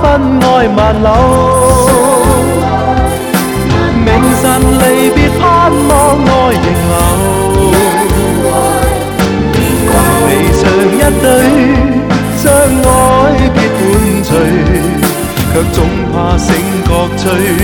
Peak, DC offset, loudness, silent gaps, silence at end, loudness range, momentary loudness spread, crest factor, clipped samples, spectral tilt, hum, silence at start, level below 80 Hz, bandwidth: 0 dBFS; under 0.1%; -9 LUFS; none; 0 s; 2 LU; 4 LU; 8 dB; 0.2%; -5.5 dB/octave; none; 0 s; -18 dBFS; 19.5 kHz